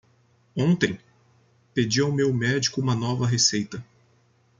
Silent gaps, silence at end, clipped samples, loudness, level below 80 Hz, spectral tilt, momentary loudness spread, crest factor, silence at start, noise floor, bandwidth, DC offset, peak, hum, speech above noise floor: none; 0.75 s; under 0.1%; -23 LUFS; -60 dBFS; -4.5 dB/octave; 14 LU; 20 dB; 0.55 s; -62 dBFS; 9.4 kHz; under 0.1%; -6 dBFS; none; 39 dB